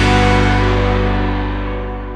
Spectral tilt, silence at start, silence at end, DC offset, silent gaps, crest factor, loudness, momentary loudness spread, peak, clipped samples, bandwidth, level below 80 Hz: -6 dB/octave; 0 s; 0 s; under 0.1%; none; 14 dB; -16 LUFS; 11 LU; 0 dBFS; under 0.1%; 10 kHz; -20 dBFS